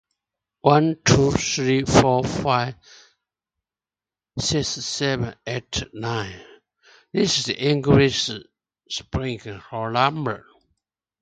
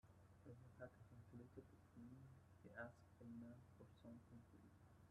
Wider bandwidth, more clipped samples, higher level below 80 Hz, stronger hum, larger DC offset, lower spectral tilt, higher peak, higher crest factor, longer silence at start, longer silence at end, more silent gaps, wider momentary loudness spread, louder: second, 9.4 kHz vs 11.5 kHz; neither; first, -44 dBFS vs -80 dBFS; neither; neither; second, -4.5 dB/octave vs -7.5 dB/octave; first, 0 dBFS vs -42 dBFS; about the same, 24 dB vs 22 dB; first, 0.65 s vs 0.05 s; first, 0.85 s vs 0 s; neither; first, 14 LU vs 9 LU; first, -21 LUFS vs -63 LUFS